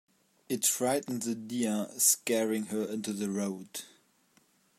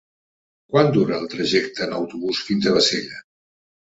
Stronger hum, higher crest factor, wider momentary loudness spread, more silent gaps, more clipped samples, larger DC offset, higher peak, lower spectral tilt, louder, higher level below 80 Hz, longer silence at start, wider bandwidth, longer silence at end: neither; about the same, 22 dB vs 20 dB; first, 12 LU vs 9 LU; neither; neither; neither; second, -12 dBFS vs -2 dBFS; second, -3 dB/octave vs -4.5 dB/octave; second, -30 LUFS vs -20 LUFS; second, -80 dBFS vs -60 dBFS; second, 0.5 s vs 0.7 s; first, 16 kHz vs 8 kHz; about the same, 0.9 s vs 0.8 s